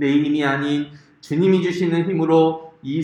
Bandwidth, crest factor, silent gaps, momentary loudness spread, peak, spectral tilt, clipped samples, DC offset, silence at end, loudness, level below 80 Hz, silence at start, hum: 9.4 kHz; 14 dB; none; 10 LU; -4 dBFS; -7.5 dB/octave; under 0.1%; under 0.1%; 0 s; -19 LUFS; -64 dBFS; 0 s; none